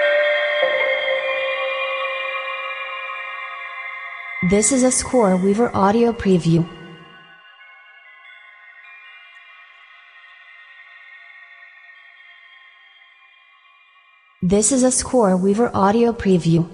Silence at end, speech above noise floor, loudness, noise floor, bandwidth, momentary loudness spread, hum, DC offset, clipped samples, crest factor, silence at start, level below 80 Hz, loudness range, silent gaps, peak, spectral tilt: 0 s; 37 dB; -18 LUFS; -53 dBFS; 11 kHz; 24 LU; none; under 0.1%; under 0.1%; 16 dB; 0 s; -48 dBFS; 24 LU; none; -4 dBFS; -4.5 dB/octave